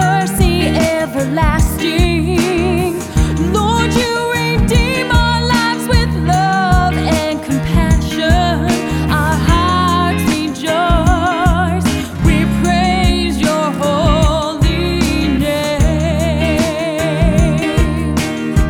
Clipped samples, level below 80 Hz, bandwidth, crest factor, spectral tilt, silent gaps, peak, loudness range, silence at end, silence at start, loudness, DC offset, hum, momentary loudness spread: under 0.1%; -20 dBFS; 17.5 kHz; 14 dB; -5.5 dB/octave; none; 0 dBFS; 1 LU; 0 s; 0 s; -14 LUFS; under 0.1%; none; 4 LU